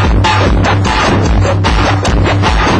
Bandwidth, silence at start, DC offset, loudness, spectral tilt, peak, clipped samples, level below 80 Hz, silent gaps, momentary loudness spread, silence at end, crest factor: 10 kHz; 0 s; under 0.1%; -10 LUFS; -5.5 dB/octave; 0 dBFS; under 0.1%; -16 dBFS; none; 1 LU; 0 s; 10 dB